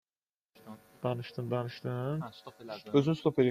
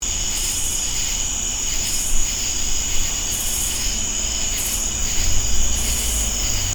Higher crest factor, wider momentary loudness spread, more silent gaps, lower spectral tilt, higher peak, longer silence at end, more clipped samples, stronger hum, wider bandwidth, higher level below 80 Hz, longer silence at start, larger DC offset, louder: first, 22 dB vs 16 dB; first, 22 LU vs 1 LU; neither; first, -8 dB/octave vs -1 dB/octave; second, -12 dBFS vs -4 dBFS; about the same, 0 s vs 0 s; neither; neither; second, 14.5 kHz vs over 20 kHz; second, -72 dBFS vs -26 dBFS; first, 0.65 s vs 0 s; neither; second, -33 LUFS vs -20 LUFS